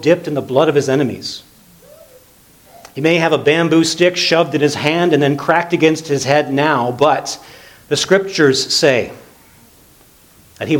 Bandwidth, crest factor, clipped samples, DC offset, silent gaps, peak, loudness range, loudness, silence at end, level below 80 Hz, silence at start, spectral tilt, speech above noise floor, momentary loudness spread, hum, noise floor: 19 kHz; 16 dB; under 0.1%; under 0.1%; none; 0 dBFS; 4 LU; -14 LUFS; 0 s; -56 dBFS; 0 s; -4.5 dB/octave; 33 dB; 10 LU; none; -47 dBFS